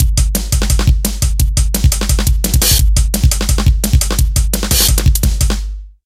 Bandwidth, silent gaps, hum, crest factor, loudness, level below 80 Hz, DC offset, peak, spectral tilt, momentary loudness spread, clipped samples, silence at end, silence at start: 16 kHz; none; none; 12 dB; -13 LUFS; -14 dBFS; under 0.1%; 0 dBFS; -3.5 dB/octave; 5 LU; under 0.1%; 0.15 s; 0 s